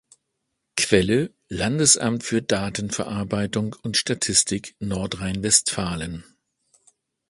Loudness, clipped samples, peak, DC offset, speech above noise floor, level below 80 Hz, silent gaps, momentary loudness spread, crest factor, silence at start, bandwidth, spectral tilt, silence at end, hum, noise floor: -22 LUFS; under 0.1%; -2 dBFS; under 0.1%; 55 dB; -48 dBFS; none; 11 LU; 24 dB; 0.75 s; 11.5 kHz; -3 dB/octave; 1.05 s; none; -78 dBFS